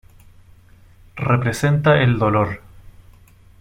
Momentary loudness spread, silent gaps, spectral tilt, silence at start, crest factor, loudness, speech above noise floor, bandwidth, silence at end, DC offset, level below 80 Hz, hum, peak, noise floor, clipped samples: 14 LU; none; -7 dB/octave; 1.15 s; 18 dB; -18 LUFS; 31 dB; 15.5 kHz; 0.8 s; under 0.1%; -46 dBFS; none; -2 dBFS; -48 dBFS; under 0.1%